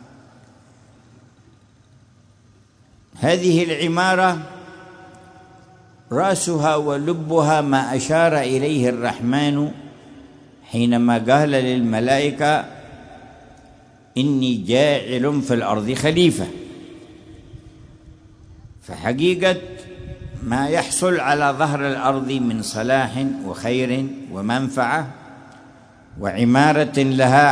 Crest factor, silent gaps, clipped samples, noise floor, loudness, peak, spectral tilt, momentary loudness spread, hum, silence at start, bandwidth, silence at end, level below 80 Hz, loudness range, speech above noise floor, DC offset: 18 dB; none; under 0.1%; -53 dBFS; -19 LUFS; -2 dBFS; -5 dB/octave; 15 LU; none; 3.15 s; 11 kHz; 0 s; -52 dBFS; 5 LU; 35 dB; under 0.1%